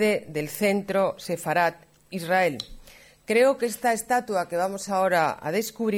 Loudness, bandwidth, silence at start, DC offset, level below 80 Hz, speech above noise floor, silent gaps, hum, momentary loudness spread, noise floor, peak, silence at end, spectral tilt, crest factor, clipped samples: -25 LUFS; 19.5 kHz; 0 s; under 0.1%; -58 dBFS; 26 dB; none; none; 10 LU; -50 dBFS; -10 dBFS; 0 s; -4.5 dB/octave; 16 dB; under 0.1%